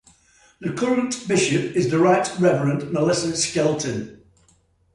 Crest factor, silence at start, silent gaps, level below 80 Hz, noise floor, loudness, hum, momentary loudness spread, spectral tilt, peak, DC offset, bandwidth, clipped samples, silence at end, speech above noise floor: 16 dB; 0.6 s; none; -58 dBFS; -60 dBFS; -21 LUFS; none; 10 LU; -5 dB/octave; -6 dBFS; under 0.1%; 11.5 kHz; under 0.1%; 0.8 s; 40 dB